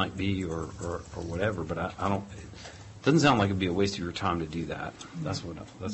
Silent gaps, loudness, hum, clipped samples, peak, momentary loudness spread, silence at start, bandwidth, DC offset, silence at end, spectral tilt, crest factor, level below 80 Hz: none; -30 LUFS; none; under 0.1%; -12 dBFS; 17 LU; 0 s; 8.6 kHz; under 0.1%; 0 s; -5.5 dB/octave; 18 dB; -48 dBFS